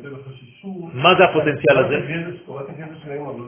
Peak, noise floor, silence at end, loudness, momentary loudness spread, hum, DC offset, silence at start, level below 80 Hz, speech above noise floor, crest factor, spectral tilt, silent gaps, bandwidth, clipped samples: 0 dBFS; -39 dBFS; 0 s; -16 LUFS; 21 LU; none; under 0.1%; 0 s; -56 dBFS; 20 dB; 20 dB; -9.5 dB/octave; none; 3.6 kHz; under 0.1%